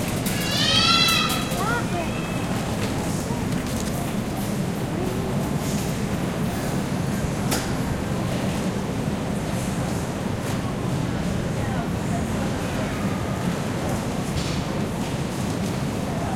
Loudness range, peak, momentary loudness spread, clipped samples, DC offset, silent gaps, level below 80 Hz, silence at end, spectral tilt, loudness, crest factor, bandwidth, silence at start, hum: 5 LU; -6 dBFS; 6 LU; under 0.1%; under 0.1%; none; -40 dBFS; 0 s; -4.5 dB/octave; -24 LUFS; 18 dB; 16.5 kHz; 0 s; none